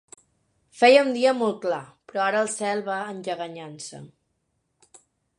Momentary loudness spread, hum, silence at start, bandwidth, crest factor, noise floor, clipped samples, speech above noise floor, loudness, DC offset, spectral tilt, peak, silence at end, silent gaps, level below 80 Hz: 20 LU; none; 0.75 s; 11.5 kHz; 22 dB; -74 dBFS; under 0.1%; 51 dB; -23 LUFS; under 0.1%; -3.5 dB/octave; -4 dBFS; 1.3 s; none; -78 dBFS